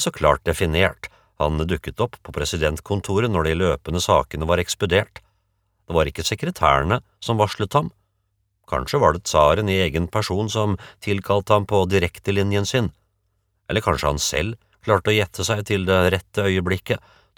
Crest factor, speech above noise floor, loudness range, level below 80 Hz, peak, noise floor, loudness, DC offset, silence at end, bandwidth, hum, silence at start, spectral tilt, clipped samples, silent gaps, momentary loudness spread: 20 dB; 50 dB; 2 LU; -38 dBFS; -2 dBFS; -70 dBFS; -21 LUFS; under 0.1%; 0.4 s; 19 kHz; none; 0 s; -5 dB/octave; under 0.1%; none; 8 LU